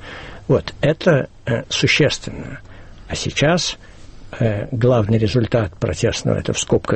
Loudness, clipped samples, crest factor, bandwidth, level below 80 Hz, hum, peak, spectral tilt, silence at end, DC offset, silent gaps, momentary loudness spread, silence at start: -18 LUFS; under 0.1%; 16 dB; 8.8 kHz; -40 dBFS; none; -2 dBFS; -5 dB/octave; 0 s; under 0.1%; none; 16 LU; 0 s